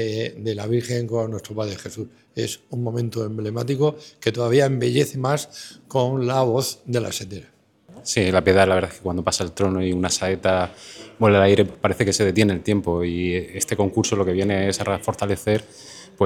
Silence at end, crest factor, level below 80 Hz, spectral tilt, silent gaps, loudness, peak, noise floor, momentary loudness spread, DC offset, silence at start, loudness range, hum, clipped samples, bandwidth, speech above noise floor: 0 s; 20 dB; -56 dBFS; -5 dB/octave; none; -22 LUFS; -2 dBFS; -47 dBFS; 12 LU; under 0.1%; 0 s; 6 LU; none; under 0.1%; 17.5 kHz; 26 dB